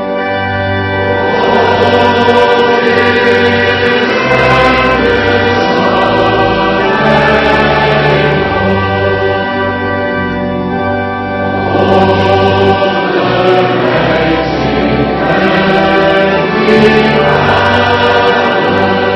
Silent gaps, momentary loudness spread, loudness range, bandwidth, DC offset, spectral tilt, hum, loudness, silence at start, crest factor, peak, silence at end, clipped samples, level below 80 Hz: none; 6 LU; 3 LU; 10.5 kHz; under 0.1%; -6.5 dB/octave; none; -9 LUFS; 0 s; 10 dB; 0 dBFS; 0 s; 0.7%; -32 dBFS